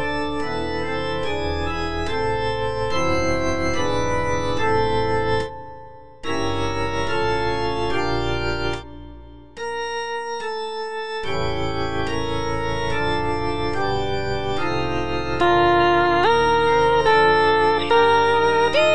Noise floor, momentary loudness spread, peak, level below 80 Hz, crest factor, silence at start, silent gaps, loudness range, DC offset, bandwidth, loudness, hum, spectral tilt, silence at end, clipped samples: -42 dBFS; 11 LU; -6 dBFS; -38 dBFS; 16 dB; 0 s; none; 9 LU; 3%; 10 kHz; -21 LUFS; none; -5.5 dB/octave; 0 s; under 0.1%